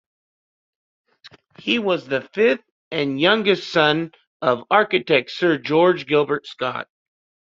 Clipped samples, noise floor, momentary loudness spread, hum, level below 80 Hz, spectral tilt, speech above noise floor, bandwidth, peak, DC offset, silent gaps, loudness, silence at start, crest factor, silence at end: under 0.1%; under -90 dBFS; 10 LU; none; -66 dBFS; -6 dB/octave; over 70 dB; 7.6 kHz; 0 dBFS; under 0.1%; 2.71-2.91 s, 4.27-4.40 s; -20 LUFS; 1.25 s; 20 dB; 0.55 s